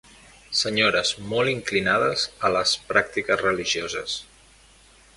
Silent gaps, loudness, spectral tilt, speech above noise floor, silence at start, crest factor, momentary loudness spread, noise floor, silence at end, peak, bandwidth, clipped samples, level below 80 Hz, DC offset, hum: none; -23 LUFS; -2.5 dB/octave; 30 dB; 0.5 s; 22 dB; 7 LU; -53 dBFS; 0.95 s; -4 dBFS; 11.5 kHz; under 0.1%; -54 dBFS; under 0.1%; none